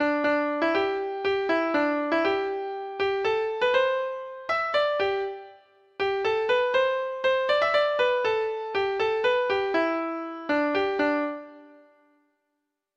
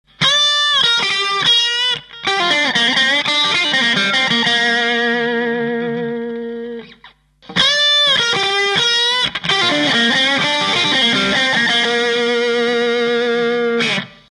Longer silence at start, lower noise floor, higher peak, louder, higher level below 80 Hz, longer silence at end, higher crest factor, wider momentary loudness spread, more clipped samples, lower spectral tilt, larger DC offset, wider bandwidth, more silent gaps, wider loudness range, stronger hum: second, 0 s vs 0.2 s; first, -80 dBFS vs -46 dBFS; second, -12 dBFS vs -2 dBFS; second, -25 LUFS vs -14 LUFS; second, -64 dBFS vs -54 dBFS; first, 1.3 s vs 0.2 s; about the same, 14 dB vs 14 dB; about the same, 8 LU vs 8 LU; neither; first, -4.5 dB/octave vs -2 dB/octave; neither; second, 7.8 kHz vs 11.5 kHz; neither; about the same, 2 LU vs 4 LU; neither